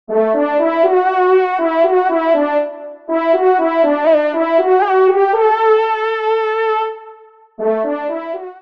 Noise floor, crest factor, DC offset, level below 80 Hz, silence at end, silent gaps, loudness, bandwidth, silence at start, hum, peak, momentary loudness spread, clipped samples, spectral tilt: -41 dBFS; 14 dB; 0.2%; -70 dBFS; 0 s; none; -14 LUFS; 5.6 kHz; 0.1 s; none; 0 dBFS; 9 LU; under 0.1%; -6.5 dB/octave